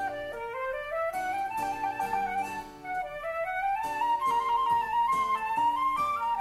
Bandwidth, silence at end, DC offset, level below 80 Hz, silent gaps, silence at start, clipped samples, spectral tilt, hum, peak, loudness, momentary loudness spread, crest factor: 15.5 kHz; 0 s; under 0.1%; -58 dBFS; none; 0 s; under 0.1%; -3.5 dB/octave; none; -18 dBFS; -30 LUFS; 8 LU; 12 dB